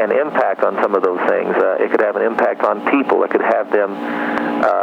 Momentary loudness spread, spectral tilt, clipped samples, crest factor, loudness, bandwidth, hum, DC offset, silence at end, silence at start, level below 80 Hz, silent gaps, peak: 3 LU; -7 dB/octave; under 0.1%; 14 dB; -16 LUFS; 7.8 kHz; none; under 0.1%; 0 s; 0 s; -64 dBFS; none; -2 dBFS